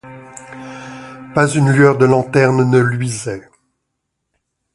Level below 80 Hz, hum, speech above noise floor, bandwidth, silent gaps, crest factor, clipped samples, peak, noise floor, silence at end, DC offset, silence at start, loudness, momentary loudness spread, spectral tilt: -52 dBFS; none; 61 dB; 11.5 kHz; none; 16 dB; under 0.1%; 0 dBFS; -74 dBFS; 1.35 s; under 0.1%; 0.05 s; -14 LUFS; 22 LU; -6.5 dB/octave